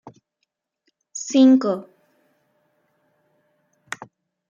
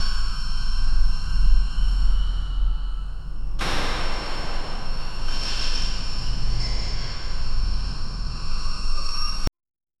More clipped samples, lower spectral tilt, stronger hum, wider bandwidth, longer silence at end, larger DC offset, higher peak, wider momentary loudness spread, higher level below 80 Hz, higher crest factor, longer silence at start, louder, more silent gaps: neither; about the same, -4.5 dB/octave vs -4 dB/octave; neither; about the same, 8.6 kHz vs 9.4 kHz; first, 2.7 s vs 0.5 s; second, under 0.1% vs 0.4%; about the same, -6 dBFS vs -4 dBFS; first, 22 LU vs 7 LU; second, -80 dBFS vs -22 dBFS; about the same, 18 dB vs 16 dB; first, 1.15 s vs 0 s; first, -18 LUFS vs -29 LUFS; neither